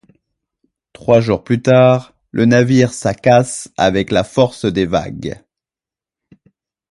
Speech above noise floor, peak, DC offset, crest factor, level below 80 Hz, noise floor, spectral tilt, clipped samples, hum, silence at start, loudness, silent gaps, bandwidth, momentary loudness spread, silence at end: 76 dB; 0 dBFS; under 0.1%; 16 dB; -44 dBFS; -89 dBFS; -6 dB/octave; under 0.1%; none; 1.05 s; -14 LUFS; none; 11.5 kHz; 15 LU; 1.55 s